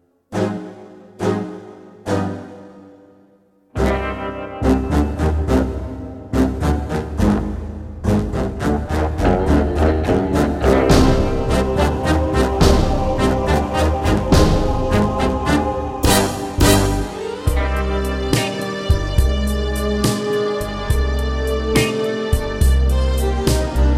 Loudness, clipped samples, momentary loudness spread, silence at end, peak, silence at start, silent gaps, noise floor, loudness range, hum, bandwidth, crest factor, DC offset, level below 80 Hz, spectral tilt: -18 LUFS; under 0.1%; 9 LU; 0 s; 0 dBFS; 0.3 s; none; -54 dBFS; 6 LU; none; 16.5 kHz; 18 dB; under 0.1%; -22 dBFS; -6 dB/octave